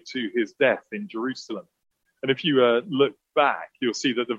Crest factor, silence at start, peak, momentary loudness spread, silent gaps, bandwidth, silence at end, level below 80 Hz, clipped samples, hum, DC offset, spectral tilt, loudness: 18 dB; 0.05 s; -6 dBFS; 13 LU; none; 8 kHz; 0 s; -76 dBFS; under 0.1%; none; under 0.1%; -4.5 dB/octave; -24 LUFS